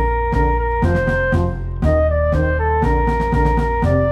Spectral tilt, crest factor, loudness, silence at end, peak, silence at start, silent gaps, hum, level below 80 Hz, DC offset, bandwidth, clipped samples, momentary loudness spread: -9 dB/octave; 12 dB; -18 LUFS; 0 s; -4 dBFS; 0 s; none; none; -22 dBFS; under 0.1%; 8.2 kHz; under 0.1%; 2 LU